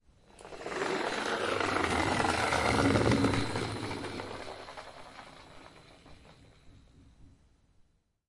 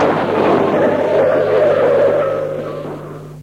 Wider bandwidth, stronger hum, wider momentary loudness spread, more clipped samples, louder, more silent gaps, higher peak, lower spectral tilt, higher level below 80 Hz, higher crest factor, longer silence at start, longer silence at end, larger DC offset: about the same, 11.5 kHz vs 11 kHz; second, none vs 50 Hz at -35 dBFS; first, 23 LU vs 14 LU; neither; second, -30 LUFS vs -14 LUFS; neither; second, -12 dBFS vs -2 dBFS; second, -5 dB/octave vs -7 dB/octave; about the same, -52 dBFS vs -50 dBFS; first, 22 dB vs 12 dB; first, 0.4 s vs 0 s; first, 1 s vs 0 s; neither